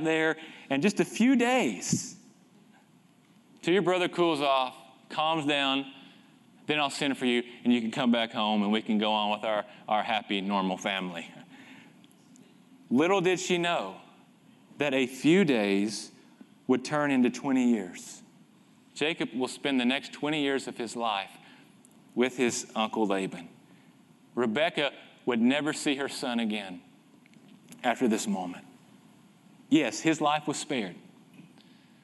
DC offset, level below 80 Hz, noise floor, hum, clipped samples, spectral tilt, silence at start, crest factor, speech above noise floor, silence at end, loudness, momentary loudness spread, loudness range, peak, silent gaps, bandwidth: under 0.1%; -80 dBFS; -61 dBFS; none; under 0.1%; -4 dB/octave; 0 s; 18 dB; 33 dB; 0.65 s; -28 LUFS; 13 LU; 4 LU; -12 dBFS; none; 12 kHz